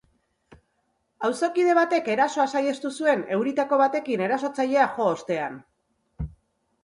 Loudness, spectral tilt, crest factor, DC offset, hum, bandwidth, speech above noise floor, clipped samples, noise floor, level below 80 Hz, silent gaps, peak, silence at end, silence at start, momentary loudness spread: -24 LUFS; -5 dB/octave; 18 dB; under 0.1%; none; 11.5 kHz; 49 dB; under 0.1%; -72 dBFS; -52 dBFS; none; -8 dBFS; 0.55 s; 0.5 s; 13 LU